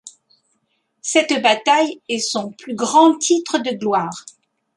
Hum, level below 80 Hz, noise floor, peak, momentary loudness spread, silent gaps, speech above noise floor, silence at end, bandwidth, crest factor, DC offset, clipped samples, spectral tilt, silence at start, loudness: none; -72 dBFS; -69 dBFS; -2 dBFS; 14 LU; none; 51 dB; 0.55 s; 11.5 kHz; 18 dB; under 0.1%; under 0.1%; -2.5 dB/octave; 0.05 s; -17 LUFS